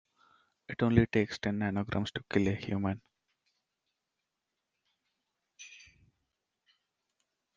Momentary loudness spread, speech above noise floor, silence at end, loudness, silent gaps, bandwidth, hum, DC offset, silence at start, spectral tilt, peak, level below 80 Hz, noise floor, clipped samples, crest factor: 23 LU; 56 dB; 1.8 s; -32 LUFS; none; 7.4 kHz; none; under 0.1%; 0.7 s; -7 dB/octave; -12 dBFS; -58 dBFS; -87 dBFS; under 0.1%; 24 dB